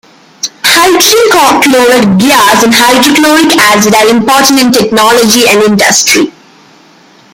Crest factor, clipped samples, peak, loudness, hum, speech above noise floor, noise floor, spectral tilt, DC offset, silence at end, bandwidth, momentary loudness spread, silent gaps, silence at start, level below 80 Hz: 6 dB; 0.8%; 0 dBFS; -4 LUFS; none; 34 dB; -39 dBFS; -2.5 dB/octave; under 0.1%; 1.05 s; over 20 kHz; 3 LU; none; 0.45 s; -44 dBFS